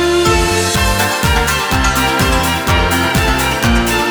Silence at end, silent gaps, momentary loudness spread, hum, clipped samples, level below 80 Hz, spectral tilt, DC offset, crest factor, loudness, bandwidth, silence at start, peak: 0 s; none; 1 LU; none; under 0.1%; -22 dBFS; -4 dB/octave; under 0.1%; 12 dB; -13 LUFS; over 20 kHz; 0 s; 0 dBFS